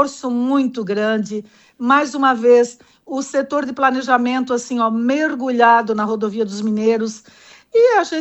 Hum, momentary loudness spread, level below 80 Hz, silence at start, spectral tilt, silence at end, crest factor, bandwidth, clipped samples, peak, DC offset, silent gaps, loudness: none; 10 LU; -66 dBFS; 0 s; -4.5 dB/octave; 0 s; 16 dB; 8.4 kHz; under 0.1%; -2 dBFS; under 0.1%; none; -17 LUFS